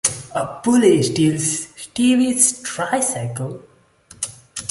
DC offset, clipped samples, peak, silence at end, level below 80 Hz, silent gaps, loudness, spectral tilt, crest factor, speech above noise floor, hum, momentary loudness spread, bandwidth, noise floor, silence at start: under 0.1%; under 0.1%; 0 dBFS; 0 s; -56 dBFS; none; -18 LUFS; -4 dB/octave; 20 dB; 31 dB; none; 15 LU; 12 kHz; -49 dBFS; 0.05 s